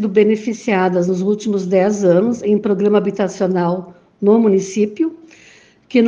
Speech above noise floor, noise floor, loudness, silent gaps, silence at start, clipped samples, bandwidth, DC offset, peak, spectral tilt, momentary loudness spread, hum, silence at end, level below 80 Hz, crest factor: 31 dB; -46 dBFS; -16 LUFS; none; 0 s; under 0.1%; 7.8 kHz; under 0.1%; -2 dBFS; -7 dB/octave; 6 LU; none; 0 s; -62 dBFS; 14 dB